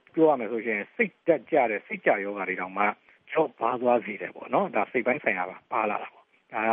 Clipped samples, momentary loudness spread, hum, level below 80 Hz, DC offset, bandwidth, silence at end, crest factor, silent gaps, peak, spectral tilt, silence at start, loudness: under 0.1%; 7 LU; none; -78 dBFS; under 0.1%; 3.8 kHz; 0 s; 20 dB; none; -8 dBFS; -4 dB/octave; 0.15 s; -27 LUFS